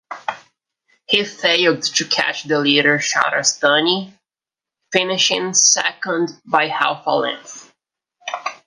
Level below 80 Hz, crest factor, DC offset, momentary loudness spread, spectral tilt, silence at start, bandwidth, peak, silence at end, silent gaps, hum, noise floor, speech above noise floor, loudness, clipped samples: -70 dBFS; 18 dB; under 0.1%; 15 LU; -1.5 dB/octave; 0.1 s; 11 kHz; 0 dBFS; 0.1 s; none; none; -89 dBFS; 72 dB; -16 LUFS; under 0.1%